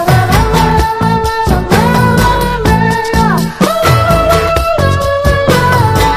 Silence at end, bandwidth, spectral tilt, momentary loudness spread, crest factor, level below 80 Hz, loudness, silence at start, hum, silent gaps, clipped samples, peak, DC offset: 0 s; 15.5 kHz; -5.5 dB/octave; 3 LU; 10 dB; -20 dBFS; -10 LUFS; 0 s; none; none; 0.5%; 0 dBFS; under 0.1%